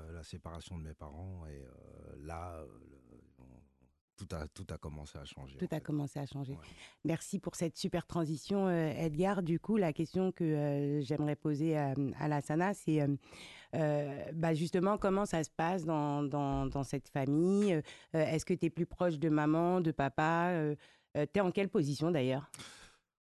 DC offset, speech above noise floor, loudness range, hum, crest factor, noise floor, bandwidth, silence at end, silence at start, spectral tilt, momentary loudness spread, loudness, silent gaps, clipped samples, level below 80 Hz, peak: under 0.1%; 29 dB; 16 LU; none; 16 dB; -63 dBFS; 12.5 kHz; 0.5 s; 0 s; -7 dB/octave; 17 LU; -35 LUFS; 4.01-4.17 s; under 0.1%; -58 dBFS; -18 dBFS